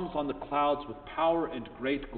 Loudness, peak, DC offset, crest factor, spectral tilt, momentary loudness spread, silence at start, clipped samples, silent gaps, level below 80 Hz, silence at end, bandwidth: -31 LUFS; -16 dBFS; under 0.1%; 16 dB; -3.5 dB/octave; 8 LU; 0 s; under 0.1%; none; -54 dBFS; 0 s; 4.6 kHz